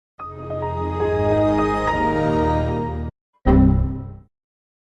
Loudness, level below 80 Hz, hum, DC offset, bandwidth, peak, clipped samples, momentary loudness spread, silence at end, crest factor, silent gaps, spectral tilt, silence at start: -20 LUFS; -28 dBFS; none; under 0.1%; 9.2 kHz; -4 dBFS; under 0.1%; 17 LU; 0.65 s; 16 dB; 3.21-3.33 s; -8.5 dB/octave; 0.2 s